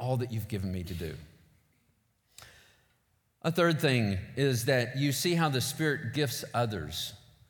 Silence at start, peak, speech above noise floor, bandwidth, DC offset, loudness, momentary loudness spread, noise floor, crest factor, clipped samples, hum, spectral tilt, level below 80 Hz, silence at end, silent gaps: 0 s; -14 dBFS; 43 dB; 19 kHz; under 0.1%; -30 LUFS; 10 LU; -73 dBFS; 18 dB; under 0.1%; none; -5 dB/octave; -58 dBFS; 0.3 s; none